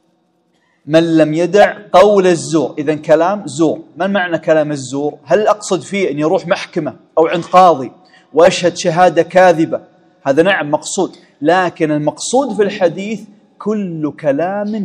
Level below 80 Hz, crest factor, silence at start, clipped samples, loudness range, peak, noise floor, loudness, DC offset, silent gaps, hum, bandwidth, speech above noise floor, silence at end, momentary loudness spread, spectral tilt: -56 dBFS; 14 dB; 0.85 s; 0.5%; 4 LU; 0 dBFS; -59 dBFS; -13 LUFS; under 0.1%; none; none; 11 kHz; 46 dB; 0 s; 10 LU; -5 dB/octave